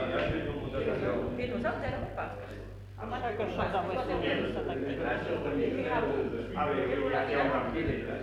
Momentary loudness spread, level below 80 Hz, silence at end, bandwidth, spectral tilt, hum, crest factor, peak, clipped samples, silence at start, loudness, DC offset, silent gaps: 8 LU; -48 dBFS; 0 s; 13 kHz; -7.5 dB/octave; none; 16 dB; -16 dBFS; under 0.1%; 0 s; -32 LUFS; under 0.1%; none